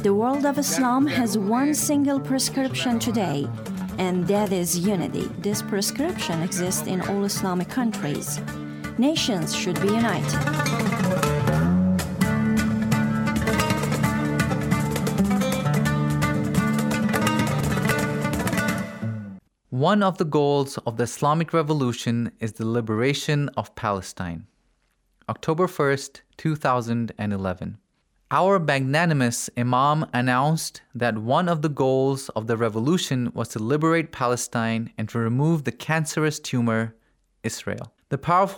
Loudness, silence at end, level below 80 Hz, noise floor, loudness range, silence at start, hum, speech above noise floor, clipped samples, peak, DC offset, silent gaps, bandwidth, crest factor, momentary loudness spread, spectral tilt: -23 LUFS; 0 s; -48 dBFS; -67 dBFS; 4 LU; 0 s; none; 44 dB; under 0.1%; -6 dBFS; under 0.1%; none; over 20 kHz; 16 dB; 8 LU; -5.5 dB/octave